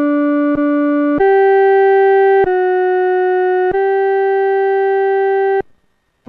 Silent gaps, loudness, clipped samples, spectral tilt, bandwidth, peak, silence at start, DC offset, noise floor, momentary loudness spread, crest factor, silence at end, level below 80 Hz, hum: none; -13 LUFS; under 0.1%; -8 dB/octave; 4.1 kHz; -4 dBFS; 0 s; under 0.1%; -60 dBFS; 4 LU; 8 dB; 0.65 s; -48 dBFS; none